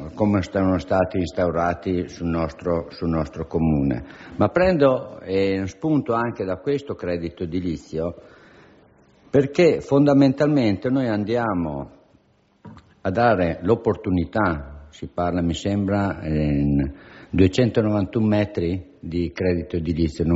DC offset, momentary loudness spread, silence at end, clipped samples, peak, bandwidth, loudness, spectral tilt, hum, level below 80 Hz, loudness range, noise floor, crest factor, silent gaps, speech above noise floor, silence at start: under 0.1%; 10 LU; 0 s; under 0.1%; -4 dBFS; 8 kHz; -22 LUFS; -7 dB/octave; none; -40 dBFS; 4 LU; -59 dBFS; 18 dB; none; 38 dB; 0 s